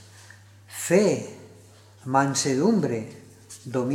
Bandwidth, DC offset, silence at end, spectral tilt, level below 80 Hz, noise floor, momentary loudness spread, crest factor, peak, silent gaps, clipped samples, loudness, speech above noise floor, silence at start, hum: 16.5 kHz; under 0.1%; 0 s; -5 dB/octave; -72 dBFS; -51 dBFS; 20 LU; 20 dB; -6 dBFS; none; under 0.1%; -24 LUFS; 28 dB; 0.7 s; none